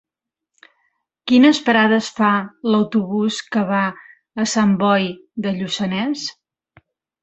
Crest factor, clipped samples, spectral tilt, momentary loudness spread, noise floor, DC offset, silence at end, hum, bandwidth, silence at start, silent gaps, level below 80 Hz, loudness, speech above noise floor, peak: 18 dB; under 0.1%; -5 dB/octave; 12 LU; -85 dBFS; under 0.1%; 0.9 s; none; 8.2 kHz; 1.25 s; none; -62 dBFS; -18 LUFS; 68 dB; -2 dBFS